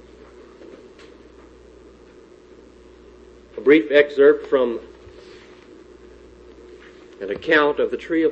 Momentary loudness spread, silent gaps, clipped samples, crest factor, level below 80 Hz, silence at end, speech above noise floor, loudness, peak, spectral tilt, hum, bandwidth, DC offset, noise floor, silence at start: 17 LU; none; under 0.1%; 20 dB; -54 dBFS; 0 s; 30 dB; -18 LUFS; -2 dBFS; -6 dB/octave; none; 7.4 kHz; under 0.1%; -47 dBFS; 3.55 s